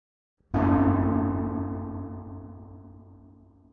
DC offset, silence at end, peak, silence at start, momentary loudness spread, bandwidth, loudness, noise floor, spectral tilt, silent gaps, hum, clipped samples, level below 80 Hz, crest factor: under 0.1%; 0.45 s; -10 dBFS; 0.5 s; 23 LU; 3.7 kHz; -26 LUFS; -54 dBFS; -11.5 dB/octave; none; none; under 0.1%; -46 dBFS; 18 dB